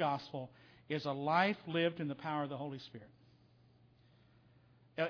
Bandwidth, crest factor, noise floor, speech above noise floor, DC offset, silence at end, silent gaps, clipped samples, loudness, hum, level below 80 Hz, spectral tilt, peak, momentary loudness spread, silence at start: 5.4 kHz; 22 dB; -67 dBFS; 29 dB; under 0.1%; 0 s; none; under 0.1%; -38 LUFS; none; -80 dBFS; -4 dB/octave; -18 dBFS; 18 LU; 0 s